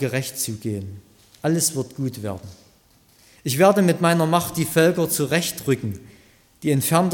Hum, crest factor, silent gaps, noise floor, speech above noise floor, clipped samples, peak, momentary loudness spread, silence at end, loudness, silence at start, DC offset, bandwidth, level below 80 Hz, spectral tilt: none; 18 dB; none; -56 dBFS; 36 dB; under 0.1%; -4 dBFS; 14 LU; 0 s; -21 LUFS; 0 s; under 0.1%; 17.5 kHz; -58 dBFS; -5 dB/octave